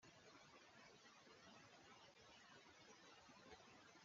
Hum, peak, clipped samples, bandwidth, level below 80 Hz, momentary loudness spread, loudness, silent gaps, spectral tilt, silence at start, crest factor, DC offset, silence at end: none; -50 dBFS; under 0.1%; 7.4 kHz; under -90 dBFS; 1 LU; -66 LUFS; none; -2 dB/octave; 0 s; 16 dB; under 0.1%; 0 s